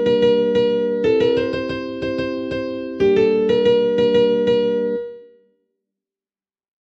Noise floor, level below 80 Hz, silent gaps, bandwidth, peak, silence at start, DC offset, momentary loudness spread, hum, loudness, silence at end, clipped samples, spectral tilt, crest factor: under -90 dBFS; -50 dBFS; none; 7.4 kHz; -4 dBFS; 0 s; under 0.1%; 9 LU; none; -18 LUFS; 1.7 s; under 0.1%; -7 dB/octave; 14 dB